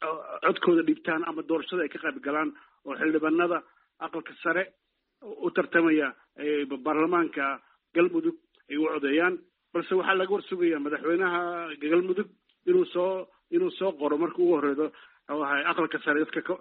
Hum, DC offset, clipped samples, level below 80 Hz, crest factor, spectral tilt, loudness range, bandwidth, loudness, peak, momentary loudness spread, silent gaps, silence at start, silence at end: none; under 0.1%; under 0.1%; -76 dBFS; 18 dB; -3 dB/octave; 2 LU; 4.2 kHz; -27 LUFS; -10 dBFS; 10 LU; none; 0 s; 0.05 s